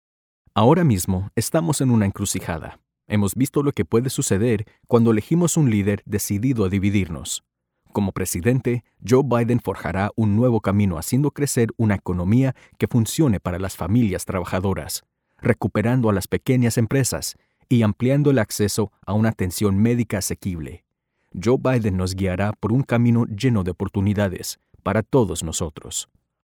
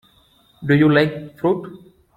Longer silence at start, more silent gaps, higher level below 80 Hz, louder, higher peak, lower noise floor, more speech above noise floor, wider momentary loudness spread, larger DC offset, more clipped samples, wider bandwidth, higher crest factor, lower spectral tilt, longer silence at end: about the same, 0.55 s vs 0.6 s; neither; first, -46 dBFS vs -54 dBFS; second, -21 LUFS vs -18 LUFS; about the same, -4 dBFS vs -2 dBFS; first, -66 dBFS vs -56 dBFS; first, 46 dB vs 38 dB; second, 9 LU vs 16 LU; neither; neither; first, over 20 kHz vs 12.5 kHz; about the same, 18 dB vs 18 dB; second, -6 dB/octave vs -8.5 dB/octave; about the same, 0.5 s vs 0.4 s